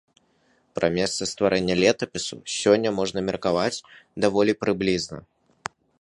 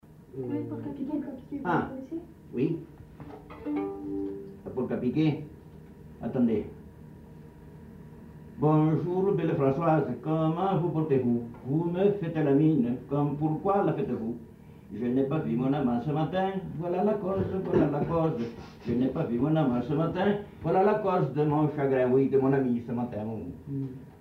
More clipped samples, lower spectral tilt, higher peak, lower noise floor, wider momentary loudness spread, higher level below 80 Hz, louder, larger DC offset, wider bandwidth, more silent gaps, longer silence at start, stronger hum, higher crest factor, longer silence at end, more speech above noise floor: neither; second, -4 dB/octave vs -10 dB/octave; first, -4 dBFS vs -12 dBFS; first, -64 dBFS vs -48 dBFS; about the same, 17 LU vs 16 LU; about the same, -54 dBFS vs -56 dBFS; first, -23 LUFS vs -28 LUFS; neither; first, 11.5 kHz vs 6 kHz; neither; first, 0.75 s vs 0.1 s; neither; first, 22 dB vs 16 dB; first, 0.8 s vs 0 s; first, 41 dB vs 21 dB